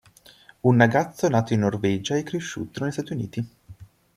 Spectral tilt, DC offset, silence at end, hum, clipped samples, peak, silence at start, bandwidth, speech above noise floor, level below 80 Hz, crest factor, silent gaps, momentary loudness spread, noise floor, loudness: -6.5 dB/octave; under 0.1%; 0.3 s; none; under 0.1%; -4 dBFS; 0.65 s; 14 kHz; 30 dB; -58 dBFS; 22 dB; none; 13 LU; -52 dBFS; -24 LUFS